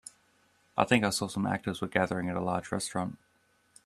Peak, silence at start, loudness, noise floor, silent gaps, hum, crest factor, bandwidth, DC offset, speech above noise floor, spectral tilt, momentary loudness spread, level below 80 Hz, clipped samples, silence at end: -8 dBFS; 0.75 s; -31 LUFS; -69 dBFS; none; none; 24 dB; 13.5 kHz; under 0.1%; 39 dB; -4.5 dB/octave; 10 LU; -64 dBFS; under 0.1%; 0.7 s